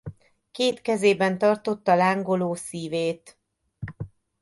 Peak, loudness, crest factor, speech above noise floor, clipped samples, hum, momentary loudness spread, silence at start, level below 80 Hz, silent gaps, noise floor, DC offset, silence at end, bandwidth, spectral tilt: -6 dBFS; -24 LUFS; 18 dB; 19 dB; under 0.1%; none; 19 LU; 0.05 s; -58 dBFS; none; -42 dBFS; under 0.1%; 0.35 s; 11.5 kHz; -5 dB/octave